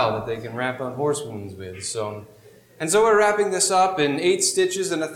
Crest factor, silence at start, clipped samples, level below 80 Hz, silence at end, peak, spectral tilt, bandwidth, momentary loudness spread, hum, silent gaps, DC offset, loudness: 14 dB; 0 s; under 0.1%; -60 dBFS; 0 s; -8 dBFS; -3 dB/octave; 16.5 kHz; 15 LU; none; none; under 0.1%; -21 LUFS